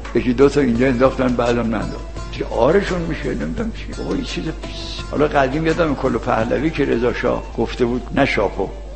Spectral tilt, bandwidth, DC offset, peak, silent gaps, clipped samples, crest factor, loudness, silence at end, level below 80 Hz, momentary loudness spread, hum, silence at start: -6.5 dB/octave; 8.8 kHz; 0.8%; 0 dBFS; none; under 0.1%; 18 dB; -19 LUFS; 0 s; -30 dBFS; 11 LU; none; 0 s